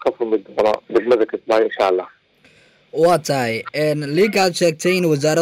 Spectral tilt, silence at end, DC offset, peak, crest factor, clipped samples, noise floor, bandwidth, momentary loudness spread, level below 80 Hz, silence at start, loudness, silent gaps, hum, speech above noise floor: -5 dB/octave; 0 s; under 0.1%; -6 dBFS; 12 dB; under 0.1%; -53 dBFS; 16 kHz; 6 LU; -60 dBFS; 0 s; -18 LUFS; none; none; 36 dB